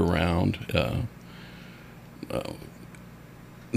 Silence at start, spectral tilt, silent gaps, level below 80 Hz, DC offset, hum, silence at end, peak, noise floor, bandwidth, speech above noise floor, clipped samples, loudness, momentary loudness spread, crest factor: 0 s; -6.5 dB/octave; none; -44 dBFS; under 0.1%; none; 0 s; -8 dBFS; -47 dBFS; 15.5 kHz; 16 dB; under 0.1%; -29 LUFS; 22 LU; 22 dB